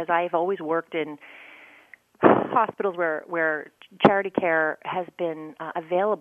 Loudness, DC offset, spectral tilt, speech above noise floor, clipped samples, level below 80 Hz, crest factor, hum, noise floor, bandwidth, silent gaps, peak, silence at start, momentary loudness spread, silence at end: -24 LUFS; under 0.1%; -8 dB/octave; 28 dB; under 0.1%; -68 dBFS; 24 dB; none; -53 dBFS; 6.6 kHz; none; 0 dBFS; 0 s; 14 LU; 0 s